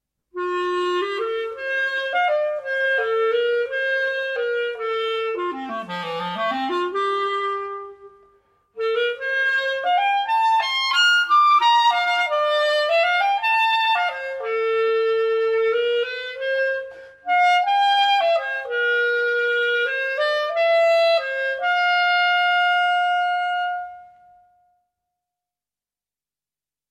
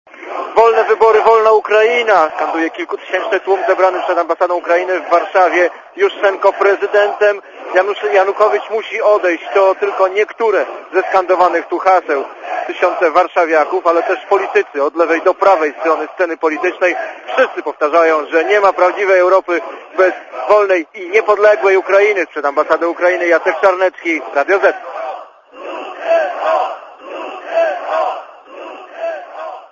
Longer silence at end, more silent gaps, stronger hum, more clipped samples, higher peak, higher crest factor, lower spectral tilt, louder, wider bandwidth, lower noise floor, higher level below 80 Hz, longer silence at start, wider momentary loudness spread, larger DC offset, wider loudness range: first, 2.85 s vs 0.05 s; neither; neither; neither; second, -8 dBFS vs 0 dBFS; about the same, 14 dB vs 14 dB; about the same, -2 dB/octave vs -3 dB/octave; second, -20 LUFS vs -13 LUFS; first, 13.5 kHz vs 7.4 kHz; first, under -90 dBFS vs -34 dBFS; second, -70 dBFS vs -64 dBFS; first, 0.35 s vs 0.15 s; second, 10 LU vs 13 LU; neither; about the same, 7 LU vs 5 LU